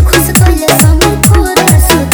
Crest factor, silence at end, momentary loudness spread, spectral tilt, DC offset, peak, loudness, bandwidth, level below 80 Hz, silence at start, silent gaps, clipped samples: 6 dB; 0 s; 1 LU; -4.5 dB/octave; under 0.1%; 0 dBFS; -7 LUFS; over 20 kHz; -12 dBFS; 0 s; none; 3%